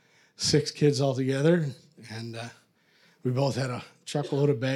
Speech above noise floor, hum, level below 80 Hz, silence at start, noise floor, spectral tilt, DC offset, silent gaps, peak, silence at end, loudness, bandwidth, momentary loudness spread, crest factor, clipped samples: 37 dB; none; -64 dBFS; 0.4 s; -63 dBFS; -5.5 dB/octave; under 0.1%; none; -10 dBFS; 0 s; -27 LUFS; 12.5 kHz; 16 LU; 18 dB; under 0.1%